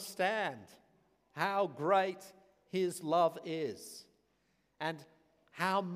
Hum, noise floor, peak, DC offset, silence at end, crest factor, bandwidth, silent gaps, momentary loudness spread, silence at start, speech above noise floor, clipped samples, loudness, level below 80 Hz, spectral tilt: none; -76 dBFS; -16 dBFS; under 0.1%; 0 s; 20 dB; 15.5 kHz; none; 19 LU; 0 s; 42 dB; under 0.1%; -35 LUFS; -86 dBFS; -4.5 dB/octave